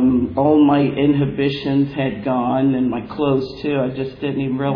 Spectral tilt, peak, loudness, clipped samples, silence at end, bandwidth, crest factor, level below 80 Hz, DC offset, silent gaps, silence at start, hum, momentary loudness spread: -9.5 dB/octave; -4 dBFS; -18 LUFS; under 0.1%; 0 s; 5.2 kHz; 14 dB; -46 dBFS; under 0.1%; none; 0 s; none; 8 LU